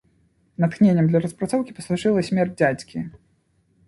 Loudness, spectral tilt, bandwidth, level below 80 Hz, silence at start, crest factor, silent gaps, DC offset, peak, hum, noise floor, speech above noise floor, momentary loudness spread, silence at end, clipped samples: -21 LUFS; -7.5 dB/octave; 11.5 kHz; -58 dBFS; 0.6 s; 18 dB; none; under 0.1%; -4 dBFS; none; -64 dBFS; 44 dB; 15 LU; 0.7 s; under 0.1%